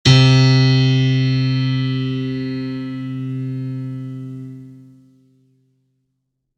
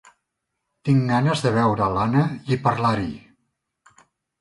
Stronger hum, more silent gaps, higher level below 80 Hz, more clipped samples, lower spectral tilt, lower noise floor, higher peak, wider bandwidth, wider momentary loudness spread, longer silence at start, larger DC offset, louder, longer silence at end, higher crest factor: neither; neither; about the same, -46 dBFS vs -50 dBFS; neither; about the same, -6 dB/octave vs -7 dB/octave; second, -73 dBFS vs -79 dBFS; first, 0 dBFS vs -6 dBFS; second, 8.4 kHz vs 11.5 kHz; first, 19 LU vs 9 LU; second, 0.05 s vs 0.85 s; neither; first, -17 LUFS vs -21 LUFS; first, 1.8 s vs 1.25 s; about the same, 18 dB vs 18 dB